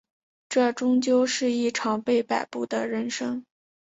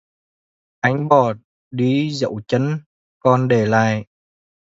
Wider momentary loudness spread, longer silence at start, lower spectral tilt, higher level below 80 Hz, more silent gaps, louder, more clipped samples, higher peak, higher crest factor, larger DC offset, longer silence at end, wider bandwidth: about the same, 8 LU vs 10 LU; second, 0.5 s vs 0.85 s; second, -3.5 dB/octave vs -7 dB/octave; second, -72 dBFS vs -58 dBFS; second, none vs 1.44-1.71 s, 2.86-3.21 s; second, -25 LUFS vs -19 LUFS; neither; second, -10 dBFS vs 0 dBFS; about the same, 16 dB vs 20 dB; neither; second, 0.55 s vs 0.75 s; about the same, 8 kHz vs 7.8 kHz